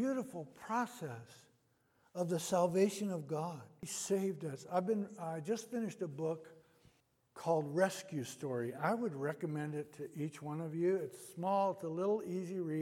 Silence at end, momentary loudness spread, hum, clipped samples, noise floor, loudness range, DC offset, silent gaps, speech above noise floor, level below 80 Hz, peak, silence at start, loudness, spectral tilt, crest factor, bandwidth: 0 s; 10 LU; none; under 0.1%; -75 dBFS; 3 LU; under 0.1%; none; 37 dB; -84 dBFS; -18 dBFS; 0 s; -38 LUFS; -5.5 dB/octave; 20 dB; 16.5 kHz